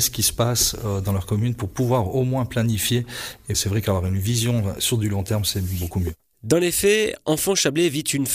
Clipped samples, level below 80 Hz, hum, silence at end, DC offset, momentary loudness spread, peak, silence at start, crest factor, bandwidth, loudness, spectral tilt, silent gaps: under 0.1%; -42 dBFS; none; 0 s; under 0.1%; 7 LU; -6 dBFS; 0 s; 14 dB; 15.5 kHz; -22 LUFS; -4 dB/octave; none